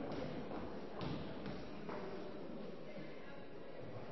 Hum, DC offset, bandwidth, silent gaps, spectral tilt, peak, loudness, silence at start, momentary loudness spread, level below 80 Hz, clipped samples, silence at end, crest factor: none; 0.3%; 6 kHz; none; -5.5 dB/octave; -32 dBFS; -48 LUFS; 0 s; 7 LU; -64 dBFS; under 0.1%; 0 s; 16 dB